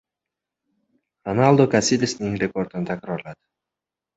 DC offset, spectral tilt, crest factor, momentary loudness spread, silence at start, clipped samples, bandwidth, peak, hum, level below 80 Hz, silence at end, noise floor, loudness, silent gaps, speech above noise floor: under 0.1%; -5.5 dB/octave; 22 dB; 15 LU; 1.25 s; under 0.1%; 8.4 kHz; -2 dBFS; none; -56 dBFS; 0.8 s; -87 dBFS; -21 LUFS; none; 67 dB